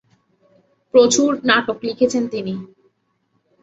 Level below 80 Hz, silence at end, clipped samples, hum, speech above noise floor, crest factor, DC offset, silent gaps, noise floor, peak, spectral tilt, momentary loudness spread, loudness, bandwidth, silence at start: -62 dBFS; 1 s; under 0.1%; none; 50 dB; 18 dB; under 0.1%; none; -67 dBFS; -2 dBFS; -3 dB/octave; 13 LU; -17 LUFS; 8 kHz; 0.95 s